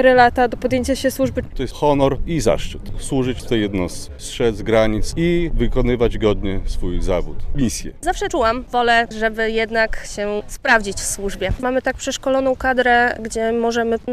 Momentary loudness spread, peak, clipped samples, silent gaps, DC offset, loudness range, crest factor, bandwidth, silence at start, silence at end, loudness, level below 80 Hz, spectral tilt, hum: 9 LU; 0 dBFS; under 0.1%; none; under 0.1%; 2 LU; 18 dB; 14.5 kHz; 0 s; 0 s; -19 LUFS; -28 dBFS; -4.5 dB/octave; none